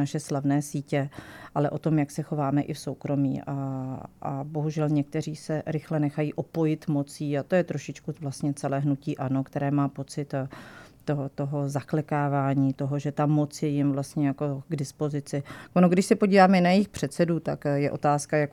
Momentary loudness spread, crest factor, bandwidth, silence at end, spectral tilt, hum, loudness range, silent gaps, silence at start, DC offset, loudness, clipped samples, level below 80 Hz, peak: 11 LU; 20 dB; 14 kHz; 0 s; -7 dB/octave; none; 6 LU; none; 0 s; under 0.1%; -27 LUFS; under 0.1%; -62 dBFS; -6 dBFS